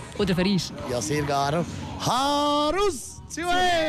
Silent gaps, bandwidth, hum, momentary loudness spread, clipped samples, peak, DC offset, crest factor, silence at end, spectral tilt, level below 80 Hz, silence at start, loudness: none; 14.5 kHz; none; 8 LU; under 0.1%; -12 dBFS; under 0.1%; 12 dB; 0 s; -4.5 dB/octave; -46 dBFS; 0 s; -24 LUFS